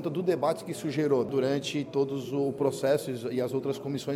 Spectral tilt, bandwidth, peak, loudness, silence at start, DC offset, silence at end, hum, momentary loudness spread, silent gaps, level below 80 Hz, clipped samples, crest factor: -6 dB/octave; 16 kHz; -14 dBFS; -29 LUFS; 0 s; under 0.1%; 0 s; none; 6 LU; none; -72 dBFS; under 0.1%; 16 dB